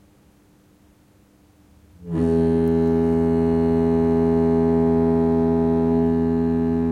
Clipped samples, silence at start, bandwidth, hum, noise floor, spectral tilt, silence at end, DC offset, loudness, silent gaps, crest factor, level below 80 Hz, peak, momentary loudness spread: under 0.1%; 2 s; 4.6 kHz; none; -55 dBFS; -10.5 dB/octave; 0 s; under 0.1%; -19 LUFS; none; 10 dB; -42 dBFS; -10 dBFS; 2 LU